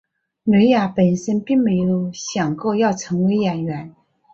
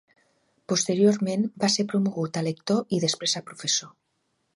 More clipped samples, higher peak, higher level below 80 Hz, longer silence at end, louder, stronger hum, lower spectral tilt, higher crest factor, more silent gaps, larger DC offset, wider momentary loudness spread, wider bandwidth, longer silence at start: neither; first, -4 dBFS vs -8 dBFS; first, -56 dBFS vs -72 dBFS; second, 0.45 s vs 0.65 s; first, -19 LUFS vs -25 LUFS; neither; first, -6.5 dB/octave vs -4 dB/octave; about the same, 14 dB vs 18 dB; neither; neither; first, 10 LU vs 7 LU; second, 7.6 kHz vs 11.5 kHz; second, 0.45 s vs 0.7 s